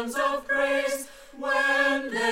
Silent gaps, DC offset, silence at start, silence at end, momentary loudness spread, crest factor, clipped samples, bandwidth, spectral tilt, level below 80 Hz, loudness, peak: none; 0.2%; 0 s; 0 s; 12 LU; 16 dB; under 0.1%; 16 kHz; -1.5 dB/octave; -58 dBFS; -25 LUFS; -10 dBFS